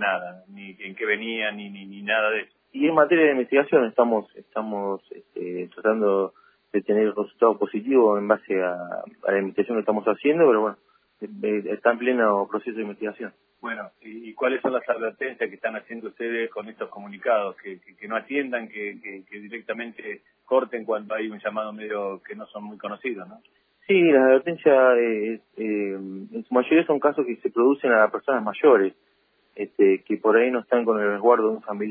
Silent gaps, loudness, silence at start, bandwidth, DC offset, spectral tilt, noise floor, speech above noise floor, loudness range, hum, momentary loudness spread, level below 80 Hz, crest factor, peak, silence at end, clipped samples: none; -23 LUFS; 0 s; 3.7 kHz; under 0.1%; -9.5 dB/octave; -65 dBFS; 42 dB; 8 LU; none; 18 LU; -82 dBFS; 20 dB; -4 dBFS; 0 s; under 0.1%